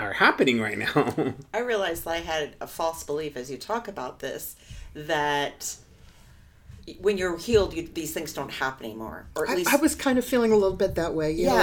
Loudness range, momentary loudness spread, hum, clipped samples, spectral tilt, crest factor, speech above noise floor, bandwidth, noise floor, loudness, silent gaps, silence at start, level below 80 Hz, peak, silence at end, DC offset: 6 LU; 14 LU; none; under 0.1%; -4 dB/octave; 20 dB; 26 dB; 19 kHz; -52 dBFS; -26 LUFS; none; 0 s; -48 dBFS; -6 dBFS; 0 s; under 0.1%